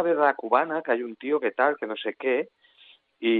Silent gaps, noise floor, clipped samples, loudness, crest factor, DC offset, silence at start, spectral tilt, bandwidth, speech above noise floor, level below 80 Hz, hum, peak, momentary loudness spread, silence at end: none; -57 dBFS; under 0.1%; -26 LUFS; 18 dB; under 0.1%; 0 s; -8 dB/octave; 4.6 kHz; 32 dB; under -90 dBFS; none; -6 dBFS; 8 LU; 0 s